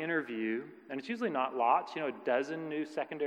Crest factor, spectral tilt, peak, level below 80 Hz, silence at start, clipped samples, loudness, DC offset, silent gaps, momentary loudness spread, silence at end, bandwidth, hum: 20 dB; -6 dB/octave; -14 dBFS; under -90 dBFS; 0 s; under 0.1%; -34 LUFS; under 0.1%; none; 10 LU; 0 s; 9.8 kHz; none